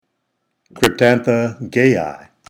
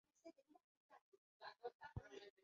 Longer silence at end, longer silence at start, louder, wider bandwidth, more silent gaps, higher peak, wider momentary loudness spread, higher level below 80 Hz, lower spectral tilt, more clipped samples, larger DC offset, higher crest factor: first, 0.35 s vs 0 s; first, 0.75 s vs 0.15 s; first, -16 LUFS vs -59 LUFS; first, over 20 kHz vs 7.2 kHz; second, none vs 0.64-0.89 s, 1.01-1.12 s, 1.18-1.40 s, 1.74-1.80 s, 2.30-2.37 s; first, 0 dBFS vs -38 dBFS; second, 7 LU vs 11 LU; first, -52 dBFS vs -72 dBFS; about the same, -5.5 dB/octave vs -4.5 dB/octave; neither; neither; about the same, 18 dB vs 22 dB